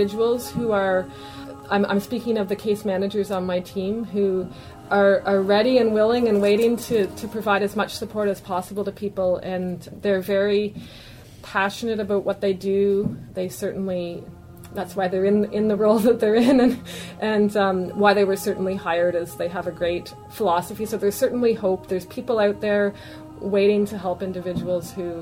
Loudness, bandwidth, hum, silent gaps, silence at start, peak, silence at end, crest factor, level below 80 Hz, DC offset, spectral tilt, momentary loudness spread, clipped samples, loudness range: -22 LUFS; 16 kHz; none; none; 0 s; -2 dBFS; 0 s; 18 dB; -52 dBFS; under 0.1%; -6 dB/octave; 12 LU; under 0.1%; 5 LU